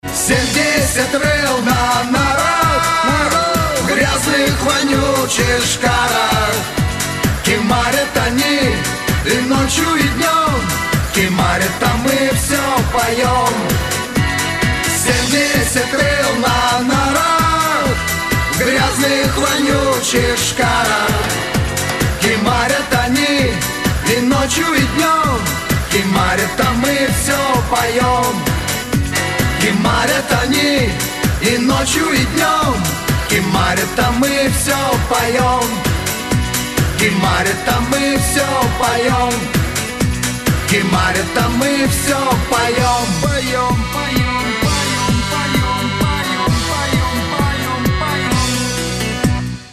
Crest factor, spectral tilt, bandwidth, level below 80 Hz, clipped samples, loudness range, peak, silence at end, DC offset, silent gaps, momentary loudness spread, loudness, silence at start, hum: 14 dB; -4 dB/octave; 14 kHz; -28 dBFS; under 0.1%; 2 LU; 0 dBFS; 0 s; under 0.1%; none; 4 LU; -14 LUFS; 0.05 s; none